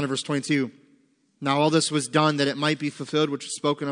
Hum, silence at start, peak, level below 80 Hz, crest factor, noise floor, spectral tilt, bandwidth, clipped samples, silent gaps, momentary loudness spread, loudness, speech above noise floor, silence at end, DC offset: none; 0 s; -6 dBFS; -76 dBFS; 20 dB; -63 dBFS; -4.5 dB/octave; 10.5 kHz; under 0.1%; none; 6 LU; -24 LUFS; 39 dB; 0 s; under 0.1%